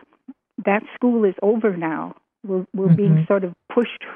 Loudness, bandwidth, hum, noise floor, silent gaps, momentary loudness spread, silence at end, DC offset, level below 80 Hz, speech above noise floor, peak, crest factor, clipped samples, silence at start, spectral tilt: -20 LUFS; 3.6 kHz; none; -46 dBFS; none; 11 LU; 0 s; under 0.1%; -72 dBFS; 27 dB; -4 dBFS; 16 dB; under 0.1%; 0.3 s; -11 dB/octave